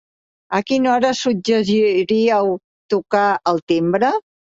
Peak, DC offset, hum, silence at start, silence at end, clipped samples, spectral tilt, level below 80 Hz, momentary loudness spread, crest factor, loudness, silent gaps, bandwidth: -4 dBFS; under 0.1%; none; 0.5 s; 0.3 s; under 0.1%; -5.5 dB/octave; -60 dBFS; 7 LU; 14 dB; -17 LUFS; 2.64-2.89 s, 3.62-3.67 s; 8 kHz